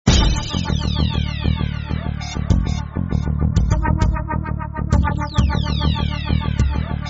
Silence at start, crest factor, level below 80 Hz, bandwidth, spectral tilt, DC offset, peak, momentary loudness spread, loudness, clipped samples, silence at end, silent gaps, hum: 0.05 s; 18 dB; -22 dBFS; 8 kHz; -5.5 dB/octave; under 0.1%; 0 dBFS; 6 LU; -20 LUFS; under 0.1%; 0 s; none; none